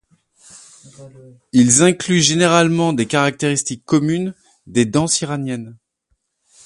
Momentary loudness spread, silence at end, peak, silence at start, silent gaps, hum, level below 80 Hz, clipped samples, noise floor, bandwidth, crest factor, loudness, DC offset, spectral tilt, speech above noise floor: 11 LU; 0.9 s; 0 dBFS; 1 s; none; none; -54 dBFS; under 0.1%; -68 dBFS; 11.5 kHz; 18 dB; -16 LUFS; under 0.1%; -4 dB/octave; 52 dB